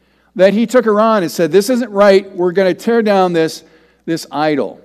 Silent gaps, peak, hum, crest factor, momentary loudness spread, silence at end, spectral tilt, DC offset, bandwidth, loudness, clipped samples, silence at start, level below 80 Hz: none; 0 dBFS; none; 14 dB; 11 LU; 0.1 s; -5.5 dB/octave; under 0.1%; 15 kHz; -13 LUFS; 0.2%; 0.35 s; -60 dBFS